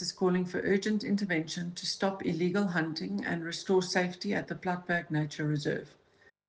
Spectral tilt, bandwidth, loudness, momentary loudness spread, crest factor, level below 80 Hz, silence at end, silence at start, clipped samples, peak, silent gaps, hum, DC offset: -5.5 dB/octave; 9.6 kHz; -32 LUFS; 6 LU; 16 dB; -70 dBFS; 0.6 s; 0 s; under 0.1%; -16 dBFS; none; none; under 0.1%